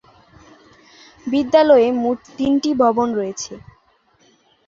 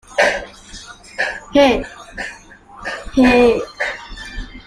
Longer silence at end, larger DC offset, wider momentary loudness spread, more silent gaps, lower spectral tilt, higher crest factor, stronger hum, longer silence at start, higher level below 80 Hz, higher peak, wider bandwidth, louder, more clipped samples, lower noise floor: first, 1.1 s vs 0.05 s; neither; second, 16 LU vs 20 LU; neither; about the same, -4.5 dB/octave vs -4 dB/octave; about the same, 18 dB vs 18 dB; neither; first, 1.25 s vs 0.1 s; second, -56 dBFS vs -36 dBFS; about the same, -2 dBFS vs 0 dBFS; second, 7.6 kHz vs 12.5 kHz; about the same, -17 LUFS vs -16 LUFS; neither; first, -58 dBFS vs -40 dBFS